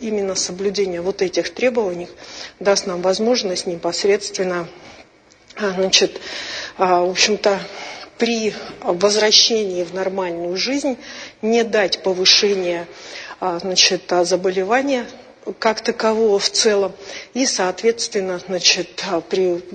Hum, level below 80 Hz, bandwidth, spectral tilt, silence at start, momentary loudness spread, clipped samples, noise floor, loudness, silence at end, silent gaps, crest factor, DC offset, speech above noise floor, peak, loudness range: none; -58 dBFS; 9.2 kHz; -2 dB/octave; 0 s; 14 LU; under 0.1%; -49 dBFS; -18 LUFS; 0 s; none; 20 dB; under 0.1%; 30 dB; 0 dBFS; 4 LU